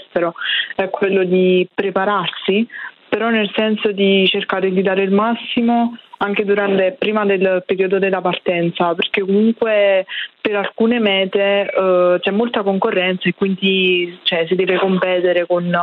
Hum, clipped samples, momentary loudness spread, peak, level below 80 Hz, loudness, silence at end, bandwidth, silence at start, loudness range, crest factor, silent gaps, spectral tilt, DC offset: none; under 0.1%; 5 LU; -2 dBFS; -62 dBFS; -16 LUFS; 0 s; 4.5 kHz; 0 s; 1 LU; 14 dB; none; -9 dB/octave; under 0.1%